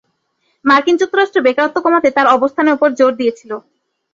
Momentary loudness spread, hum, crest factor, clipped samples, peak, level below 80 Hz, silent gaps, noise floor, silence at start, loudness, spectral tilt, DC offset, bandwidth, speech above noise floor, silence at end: 8 LU; none; 14 dB; under 0.1%; -2 dBFS; -60 dBFS; none; -65 dBFS; 0.65 s; -13 LUFS; -4 dB/octave; under 0.1%; 7.8 kHz; 52 dB; 0.55 s